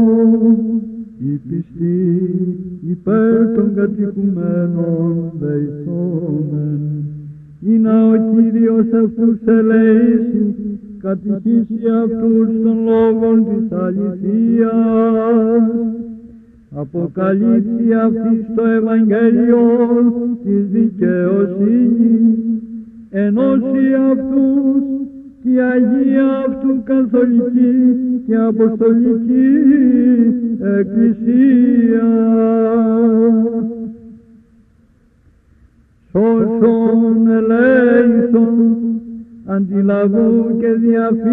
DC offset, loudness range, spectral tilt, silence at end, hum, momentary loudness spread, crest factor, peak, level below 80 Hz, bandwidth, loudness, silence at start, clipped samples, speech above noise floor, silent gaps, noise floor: under 0.1%; 5 LU; -12 dB/octave; 0 s; none; 11 LU; 12 dB; -2 dBFS; -50 dBFS; 3.6 kHz; -14 LUFS; 0 s; under 0.1%; 39 dB; none; -51 dBFS